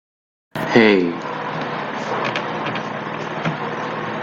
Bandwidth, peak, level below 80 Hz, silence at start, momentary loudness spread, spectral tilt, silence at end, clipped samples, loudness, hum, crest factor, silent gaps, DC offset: 14 kHz; 0 dBFS; -60 dBFS; 0.55 s; 12 LU; -6 dB/octave; 0 s; under 0.1%; -21 LUFS; none; 20 dB; none; under 0.1%